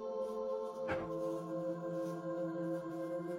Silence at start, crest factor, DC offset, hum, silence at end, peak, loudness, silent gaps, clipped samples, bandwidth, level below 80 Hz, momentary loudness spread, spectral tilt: 0 s; 16 dB; under 0.1%; none; 0 s; -24 dBFS; -40 LUFS; none; under 0.1%; 15.5 kHz; -70 dBFS; 2 LU; -7.5 dB/octave